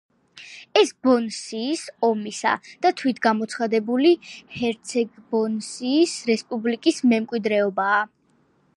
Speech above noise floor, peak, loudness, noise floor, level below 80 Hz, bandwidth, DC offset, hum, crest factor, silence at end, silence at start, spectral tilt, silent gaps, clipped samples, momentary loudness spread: 41 dB; -4 dBFS; -22 LUFS; -63 dBFS; -70 dBFS; 11.5 kHz; under 0.1%; none; 18 dB; 0.7 s; 0.35 s; -4 dB/octave; none; under 0.1%; 8 LU